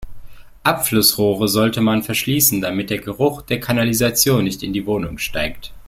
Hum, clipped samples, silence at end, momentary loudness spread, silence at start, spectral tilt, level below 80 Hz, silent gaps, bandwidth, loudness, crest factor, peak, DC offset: none; under 0.1%; 0 s; 9 LU; 0 s; -4 dB/octave; -40 dBFS; none; 16.5 kHz; -17 LUFS; 18 dB; 0 dBFS; under 0.1%